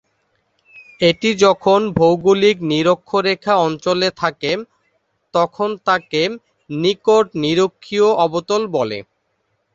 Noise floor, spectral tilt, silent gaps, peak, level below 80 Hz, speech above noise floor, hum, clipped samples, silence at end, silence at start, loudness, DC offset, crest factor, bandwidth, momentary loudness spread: -68 dBFS; -5 dB/octave; none; -2 dBFS; -54 dBFS; 52 dB; none; under 0.1%; 0.75 s; 0.75 s; -17 LUFS; under 0.1%; 16 dB; 7.8 kHz; 8 LU